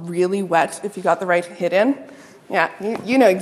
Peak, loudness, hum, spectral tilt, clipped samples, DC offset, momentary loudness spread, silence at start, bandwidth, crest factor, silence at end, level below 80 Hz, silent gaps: -2 dBFS; -20 LUFS; none; -5.5 dB/octave; under 0.1%; under 0.1%; 7 LU; 0 s; 14 kHz; 18 dB; 0 s; -72 dBFS; none